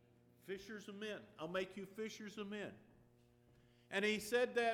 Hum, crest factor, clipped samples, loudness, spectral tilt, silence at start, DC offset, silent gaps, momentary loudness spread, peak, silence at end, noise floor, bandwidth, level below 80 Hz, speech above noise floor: none; 18 dB; under 0.1%; -43 LUFS; -4 dB/octave; 0.45 s; under 0.1%; none; 14 LU; -26 dBFS; 0 s; -70 dBFS; 18 kHz; -78 dBFS; 28 dB